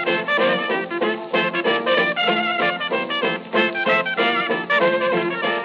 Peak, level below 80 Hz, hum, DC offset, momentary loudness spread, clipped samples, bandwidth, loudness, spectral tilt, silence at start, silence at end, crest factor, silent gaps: -6 dBFS; -70 dBFS; none; under 0.1%; 4 LU; under 0.1%; 7 kHz; -19 LUFS; -6 dB/octave; 0 s; 0 s; 14 dB; none